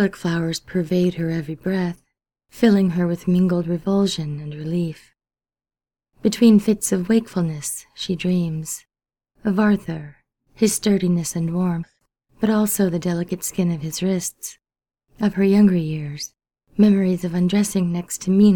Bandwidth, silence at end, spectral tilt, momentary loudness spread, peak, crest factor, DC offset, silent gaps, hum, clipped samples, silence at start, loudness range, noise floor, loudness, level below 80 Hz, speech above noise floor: 19 kHz; 0 s; -6 dB/octave; 13 LU; -2 dBFS; 18 dB; under 0.1%; none; none; under 0.1%; 0 s; 3 LU; under -90 dBFS; -21 LUFS; -52 dBFS; over 71 dB